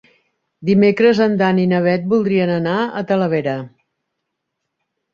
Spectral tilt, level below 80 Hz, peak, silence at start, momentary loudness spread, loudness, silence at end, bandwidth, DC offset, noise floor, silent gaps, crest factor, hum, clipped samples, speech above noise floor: -8 dB/octave; -58 dBFS; -2 dBFS; 0.6 s; 7 LU; -16 LUFS; 1.45 s; 7 kHz; under 0.1%; -76 dBFS; none; 16 dB; none; under 0.1%; 61 dB